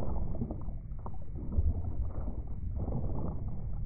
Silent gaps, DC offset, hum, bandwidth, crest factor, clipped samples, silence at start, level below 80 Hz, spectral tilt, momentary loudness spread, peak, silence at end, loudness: none; under 0.1%; none; 2.4 kHz; 14 dB; under 0.1%; 0 s; -38 dBFS; -12 dB/octave; 9 LU; -18 dBFS; 0 s; -38 LUFS